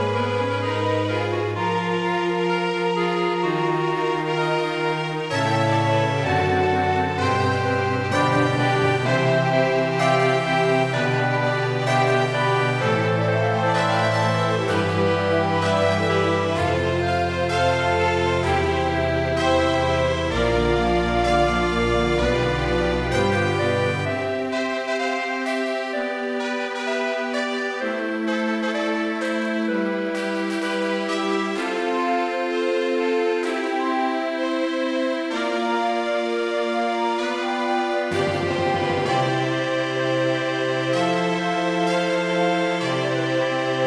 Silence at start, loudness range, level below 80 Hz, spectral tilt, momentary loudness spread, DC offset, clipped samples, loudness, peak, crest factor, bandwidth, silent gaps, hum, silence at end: 0 s; 4 LU; -42 dBFS; -6 dB/octave; 5 LU; under 0.1%; under 0.1%; -22 LUFS; -6 dBFS; 16 dB; 11 kHz; none; none; 0 s